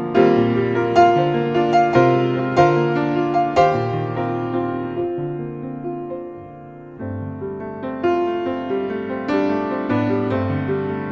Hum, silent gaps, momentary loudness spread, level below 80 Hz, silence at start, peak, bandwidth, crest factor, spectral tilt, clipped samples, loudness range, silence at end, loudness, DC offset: none; none; 14 LU; -48 dBFS; 0 s; -2 dBFS; 7.6 kHz; 18 dB; -8 dB/octave; under 0.1%; 10 LU; 0 s; -19 LUFS; under 0.1%